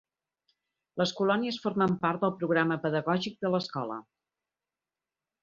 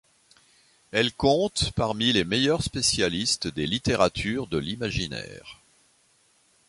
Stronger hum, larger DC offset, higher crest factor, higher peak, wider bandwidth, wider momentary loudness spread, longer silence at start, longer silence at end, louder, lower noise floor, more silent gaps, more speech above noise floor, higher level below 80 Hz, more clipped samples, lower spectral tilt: neither; neither; about the same, 20 dB vs 22 dB; second, -10 dBFS vs -6 dBFS; second, 7.4 kHz vs 11.5 kHz; about the same, 9 LU vs 8 LU; about the same, 0.95 s vs 0.95 s; first, 1.4 s vs 1.15 s; second, -29 LUFS vs -25 LUFS; first, under -90 dBFS vs -64 dBFS; neither; first, over 61 dB vs 38 dB; second, -70 dBFS vs -46 dBFS; neither; first, -6 dB/octave vs -3.5 dB/octave